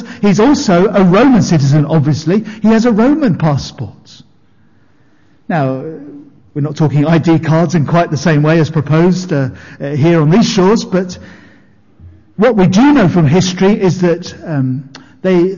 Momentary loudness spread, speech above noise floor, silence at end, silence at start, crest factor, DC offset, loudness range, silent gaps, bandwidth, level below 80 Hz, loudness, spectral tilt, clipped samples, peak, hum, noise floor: 12 LU; 40 dB; 0 s; 0 s; 8 dB; under 0.1%; 7 LU; none; 7.4 kHz; -42 dBFS; -11 LUFS; -7 dB/octave; under 0.1%; -2 dBFS; none; -51 dBFS